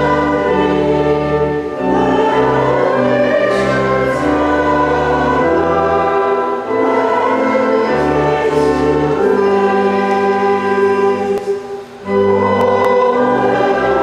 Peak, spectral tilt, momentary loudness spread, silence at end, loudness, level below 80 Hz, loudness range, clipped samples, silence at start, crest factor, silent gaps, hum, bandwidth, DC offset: -2 dBFS; -6.5 dB/octave; 3 LU; 0 s; -14 LUFS; -38 dBFS; 1 LU; under 0.1%; 0 s; 12 dB; none; none; 11 kHz; under 0.1%